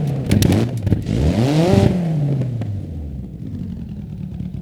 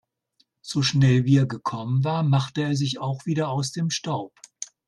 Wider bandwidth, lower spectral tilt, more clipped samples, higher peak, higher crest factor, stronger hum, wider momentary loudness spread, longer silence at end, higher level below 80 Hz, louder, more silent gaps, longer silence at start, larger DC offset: first, 18 kHz vs 11 kHz; first, -7 dB/octave vs -5.5 dB/octave; neither; first, 0 dBFS vs -6 dBFS; about the same, 18 dB vs 18 dB; neither; first, 15 LU vs 12 LU; second, 0 s vs 0.2 s; first, -32 dBFS vs -60 dBFS; first, -19 LUFS vs -24 LUFS; neither; second, 0 s vs 0.65 s; neither